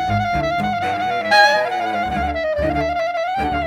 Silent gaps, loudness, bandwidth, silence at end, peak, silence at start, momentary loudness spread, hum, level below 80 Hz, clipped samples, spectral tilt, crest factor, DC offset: none; -18 LUFS; 15 kHz; 0 s; 0 dBFS; 0 s; 8 LU; none; -36 dBFS; under 0.1%; -5 dB/octave; 18 dB; under 0.1%